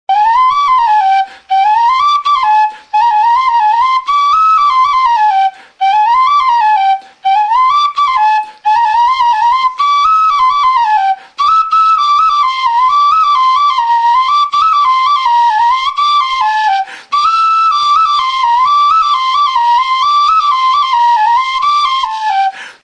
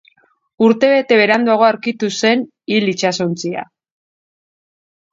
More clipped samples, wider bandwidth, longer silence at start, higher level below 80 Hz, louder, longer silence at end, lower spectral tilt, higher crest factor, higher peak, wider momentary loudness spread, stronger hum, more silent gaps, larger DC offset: neither; first, 9.6 kHz vs 7.8 kHz; second, 0.1 s vs 0.6 s; first, -52 dBFS vs -66 dBFS; first, -10 LUFS vs -15 LUFS; second, 0.1 s vs 1.5 s; second, 1.5 dB/octave vs -4.5 dB/octave; second, 8 dB vs 16 dB; about the same, -2 dBFS vs 0 dBFS; second, 4 LU vs 8 LU; neither; neither; neither